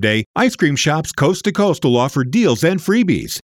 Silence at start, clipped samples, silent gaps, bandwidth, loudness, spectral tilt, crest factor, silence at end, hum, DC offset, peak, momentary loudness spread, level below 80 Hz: 0 s; under 0.1%; 0.26-0.34 s; 17.5 kHz; -16 LUFS; -5 dB/octave; 12 dB; 0.1 s; none; under 0.1%; -2 dBFS; 2 LU; -48 dBFS